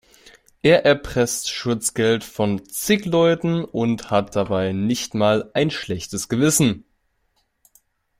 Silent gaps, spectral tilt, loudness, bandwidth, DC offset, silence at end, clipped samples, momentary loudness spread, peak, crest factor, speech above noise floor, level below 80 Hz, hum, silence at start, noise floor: none; -4.5 dB/octave; -20 LUFS; 16 kHz; under 0.1%; 1.4 s; under 0.1%; 7 LU; -2 dBFS; 20 dB; 48 dB; -50 dBFS; none; 0.65 s; -68 dBFS